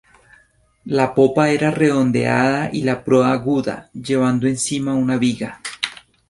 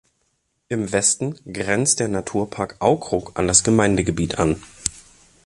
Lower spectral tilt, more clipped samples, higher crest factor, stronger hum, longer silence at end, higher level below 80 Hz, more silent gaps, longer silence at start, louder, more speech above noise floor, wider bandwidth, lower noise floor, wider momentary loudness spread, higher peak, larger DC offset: first, -5.5 dB/octave vs -4 dB/octave; neither; about the same, 18 dB vs 22 dB; neither; about the same, 0.35 s vs 0.45 s; second, -54 dBFS vs -42 dBFS; neither; first, 0.85 s vs 0.7 s; about the same, -18 LUFS vs -20 LUFS; second, 39 dB vs 49 dB; about the same, 11.5 kHz vs 11.5 kHz; second, -56 dBFS vs -70 dBFS; about the same, 10 LU vs 11 LU; about the same, -2 dBFS vs 0 dBFS; neither